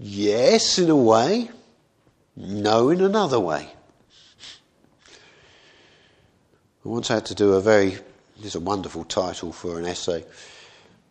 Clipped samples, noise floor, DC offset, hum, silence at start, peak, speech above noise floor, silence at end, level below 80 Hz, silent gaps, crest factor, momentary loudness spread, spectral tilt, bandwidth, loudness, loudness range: under 0.1%; -62 dBFS; under 0.1%; none; 0 s; -2 dBFS; 41 dB; 0.65 s; -60 dBFS; none; 20 dB; 23 LU; -4.5 dB/octave; 9.8 kHz; -21 LUFS; 11 LU